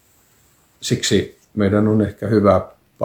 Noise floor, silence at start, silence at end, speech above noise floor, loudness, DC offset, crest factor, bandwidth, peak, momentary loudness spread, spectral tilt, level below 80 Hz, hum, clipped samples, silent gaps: -56 dBFS; 0.8 s; 0 s; 40 dB; -18 LUFS; under 0.1%; 18 dB; 18 kHz; 0 dBFS; 13 LU; -5.5 dB/octave; -48 dBFS; none; under 0.1%; none